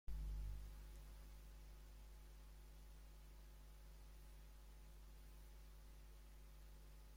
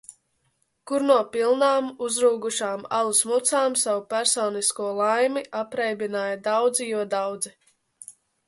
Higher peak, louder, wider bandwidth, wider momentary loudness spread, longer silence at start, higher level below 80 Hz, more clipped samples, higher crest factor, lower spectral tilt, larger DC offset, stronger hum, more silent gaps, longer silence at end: second, -38 dBFS vs -6 dBFS; second, -61 LUFS vs -23 LUFS; first, 16.5 kHz vs 12 kHz; about the same, 10 LU vs 9 LU; second, 0.05 s vs 0.85 s; first, -56 dBFS vs -74 dBFS; neither; about the same, 18 dB vs 18 dB; first, -5 dB/octave vs -1.5 dB/octave; neither; neither; neither; second, 0 s vs 0.35 s